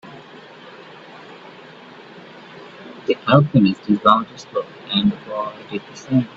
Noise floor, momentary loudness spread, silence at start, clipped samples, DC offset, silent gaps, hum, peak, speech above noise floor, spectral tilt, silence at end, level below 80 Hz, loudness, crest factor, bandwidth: -41 dBFS; 25 LU; 0.05 s; under 0.1%; under 0.1%; none; none; 0 dBFS; 23 dB; -7.5 dB/octave; 0.1 s; -58 dBFS; -19 LUFS; 22 dB; 7.8 kHz